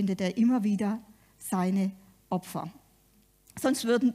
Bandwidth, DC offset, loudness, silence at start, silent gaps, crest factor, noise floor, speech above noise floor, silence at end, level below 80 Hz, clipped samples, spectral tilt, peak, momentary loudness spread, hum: 15.5 kHz; under 0.1%; -29 LUFS; 0 s; none; 16 dB; -64 dBFS; 36 dB; 0 s; -68 dBFS; under 0.1%; -6 dB/octave; -14 dBFS; 13 LU; none